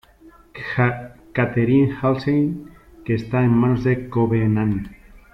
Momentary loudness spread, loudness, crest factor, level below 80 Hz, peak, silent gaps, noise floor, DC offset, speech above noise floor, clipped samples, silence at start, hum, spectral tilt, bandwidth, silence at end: 16 LU; -20 LUFS; 14 dB; -46 dBFS; -6 dBFS; none; -49 dBFS; under 0.1%; 30 dB; under 0.1%; 0.25 s; none; -9.5 dB/octave; 6 kHz; 0.15 s